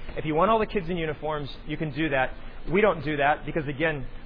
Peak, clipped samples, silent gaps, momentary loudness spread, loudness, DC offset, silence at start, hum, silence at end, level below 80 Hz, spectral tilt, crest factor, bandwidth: -10 dBFS; under 0.1%; none; 9 LU; -26 LUFS; under 0.1%; 0 s; none; 0 s; -38 dBFS; -9.5 dB/octave; 18 dB; 5.2 kHz